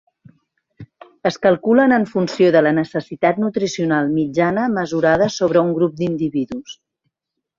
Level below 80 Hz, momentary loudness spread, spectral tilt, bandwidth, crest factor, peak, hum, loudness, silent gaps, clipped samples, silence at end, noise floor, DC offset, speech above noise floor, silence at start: -56 dBFS; 10 LU; -6 dB/octave; 7.6 kHz; 16 dB; -2 dBFS; none; -17 LUFS; none; under 0.1%; 0.85 s; -80 dBFS; under 0.1%; 63 dB; 0.8 s